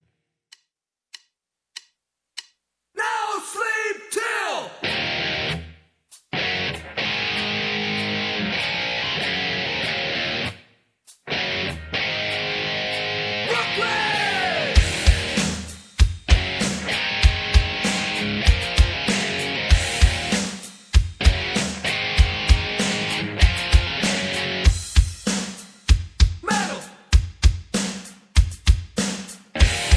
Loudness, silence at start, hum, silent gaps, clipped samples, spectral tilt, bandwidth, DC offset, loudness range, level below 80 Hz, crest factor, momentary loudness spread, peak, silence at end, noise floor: -22 LUFS; 1.75 s; none; none; under 0.1%; -4 dB/octave; 11 kHz; under 0.1%; 5 LU; -24 dBFS; 20 dB; 8 LU; -2 dBFS; 0 s; -83 dBFS